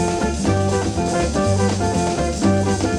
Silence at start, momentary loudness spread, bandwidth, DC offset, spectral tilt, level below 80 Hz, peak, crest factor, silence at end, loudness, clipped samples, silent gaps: 0 s; 2 LU; 12 kHz; under 0.1%; -5.5 dB/octave; -32 dBFS; -4 dBFS; 14 dB; 0 s; -19 LUFS; under 0.1%; none